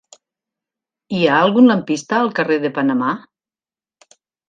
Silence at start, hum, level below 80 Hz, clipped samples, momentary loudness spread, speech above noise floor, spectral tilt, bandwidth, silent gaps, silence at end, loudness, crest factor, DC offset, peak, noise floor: 1.1 s; none; -66 dBFS; under 0.1%; 10 LU; over 75 dB; -5.5 dB/octave; 7.6 kHz; none; 1.3 s; -16 LUFS; 18 dB; under 0.1%; 0 dBFS; under -90 dBFS